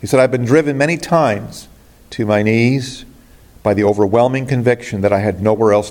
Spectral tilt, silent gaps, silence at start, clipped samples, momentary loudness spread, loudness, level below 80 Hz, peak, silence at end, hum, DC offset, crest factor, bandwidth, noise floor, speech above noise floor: -6.5 dB/octave; none; 0 s; under 0.1%; 11 LU; -15 LUFS; -48 dBFS; 0 dBFS; 0 s; none; under 0.1%; 14 dB; 17 kHz; -43 dBFS; 29 dB